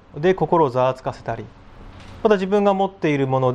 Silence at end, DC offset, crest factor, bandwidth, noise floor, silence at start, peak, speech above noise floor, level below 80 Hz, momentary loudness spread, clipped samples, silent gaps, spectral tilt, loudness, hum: 0 s; under 0.1%; 16 dB; 8.8 kHz; -40 dBFS; 0.15 s; -4 dBFS; 21 dB; -48 dBFS; 13 LU; under 0.1%; none; -7.5 dB/octave; -20 LUFS; none